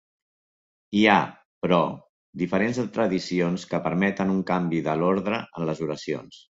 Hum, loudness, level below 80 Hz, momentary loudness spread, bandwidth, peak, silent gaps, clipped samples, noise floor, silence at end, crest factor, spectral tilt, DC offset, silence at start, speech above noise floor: none; -25 LUFS; -60 dBFS; 11 LU; 7.8 kHz; -4 dBFS; 1.45-1.61 s, 2.09-2.33 s; under 0.1%; under -90 dBFS; 0.1 s; 22 dB; -6.5 dB/octave; under 0.1%; 0.9 s; over 66 dB